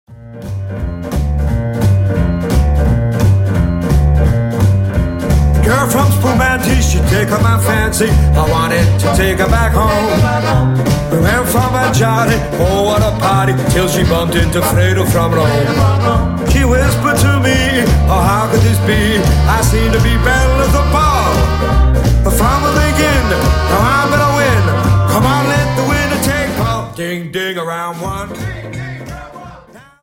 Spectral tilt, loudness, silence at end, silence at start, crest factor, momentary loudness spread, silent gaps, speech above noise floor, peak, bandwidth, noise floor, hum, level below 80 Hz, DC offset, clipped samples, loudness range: -5.5 dB/octave; -12 LUFS; 0.25 s; 0.1 s; 12 dB; 8 LU; none; 27 dB; 0 dBFS; 17 kHz; -38 dBFS; none; -18 dBFS; under 0.1%; under 0.1%; 3 LU